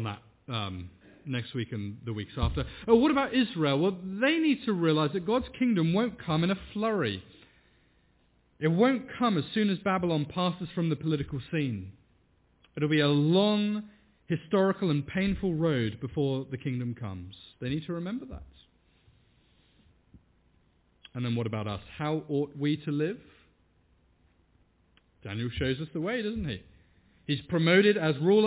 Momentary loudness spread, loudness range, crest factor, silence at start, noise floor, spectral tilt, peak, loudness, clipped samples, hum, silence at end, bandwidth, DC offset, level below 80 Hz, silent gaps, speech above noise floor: 14 LU; 11 LU; 22 dB; 0 s; -67 dBFS; -5.5 dB/octave; -8 dBFS; -29 LUFS; under 0.1%; none; 0 s; 4 kHz; under 0.1%; -50 dBFS; none; 39 dB